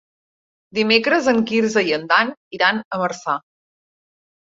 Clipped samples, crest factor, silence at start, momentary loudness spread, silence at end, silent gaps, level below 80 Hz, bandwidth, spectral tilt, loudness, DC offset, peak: under 0.1%; 20 dB; 0.75 s; 9 LU; 1.1 s; 2.37-2.51 s, 2.85-2.91 s; -64 dBFS; 7.8 kHz; -4 dB/octave; -18 LUFS; under 0.1%; -2 dBFS